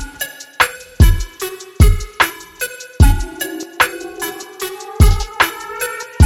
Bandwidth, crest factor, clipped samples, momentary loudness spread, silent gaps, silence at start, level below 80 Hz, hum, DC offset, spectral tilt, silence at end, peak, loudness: 17 kHz; 16 dB; under 0.1%; 12 LU; none; 0 s; -18 dBFS; none; under 0.1%; -4.5 dB/octave; 0 s; 0 dBFS; -17 LUFS